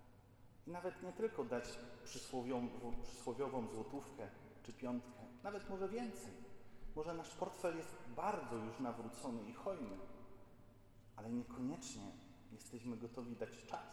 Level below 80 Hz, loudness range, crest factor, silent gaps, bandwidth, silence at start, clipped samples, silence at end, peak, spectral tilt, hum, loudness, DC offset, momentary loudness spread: -64 dBFS; 4 LU; 20 dB; none; 17.5 kHz; 0 s; under 0.1%; 0 s; -28 dBFS; -5.5 dB/octave; none; -47 LUFS; under 0.1%; 17 LU